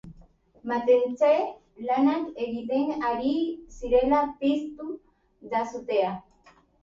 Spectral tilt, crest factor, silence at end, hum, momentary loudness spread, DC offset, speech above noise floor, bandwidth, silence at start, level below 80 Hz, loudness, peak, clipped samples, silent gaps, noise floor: -6 dB/octave; 16 dB; 0.65 s; none; 15 LU; under 0.1%; 34 dB; 7.4 kHz; 0.05 s; -54 dBFS; -26 LUFS; -10 dBFS; under 0.1%; none; -59 dBFS